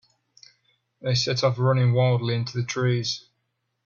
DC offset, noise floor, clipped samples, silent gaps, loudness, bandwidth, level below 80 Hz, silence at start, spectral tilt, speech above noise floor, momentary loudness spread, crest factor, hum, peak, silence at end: under 0.1%; -76 dBFS; under 0.1%; none; -24 LUFS; 7.2 kHz; -58 dBFS; 1.05 s; -5.5 dB/octave; 54 dB; 8 LU; 16 dB; none; -8 dBFS; 0.65 s